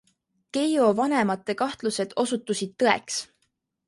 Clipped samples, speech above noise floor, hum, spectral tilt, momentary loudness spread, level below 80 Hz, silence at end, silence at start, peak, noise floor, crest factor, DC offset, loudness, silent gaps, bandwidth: under 0.1%; 50 dB; none; -4 dB/octave; 10 LU; -70 dBFS; 0.65 s; 0.55 s; -4 dBFS; -74 dBFS; 22 dB; under 0.1%; -25 LUFS; none; 11.5 kHz